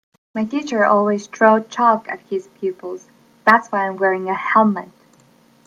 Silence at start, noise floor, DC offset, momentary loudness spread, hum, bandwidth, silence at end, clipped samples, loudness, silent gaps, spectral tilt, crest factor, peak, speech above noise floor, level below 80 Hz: 0.35 s; -53 dBFS; under 0.1%; 13 LU; none; 10.5 kHz; 0.8 s; under 0.1%; -18 LUFS; none; -6 dB/octave; 18 dB; 0 dBFS; 35 dB; -70 dBFS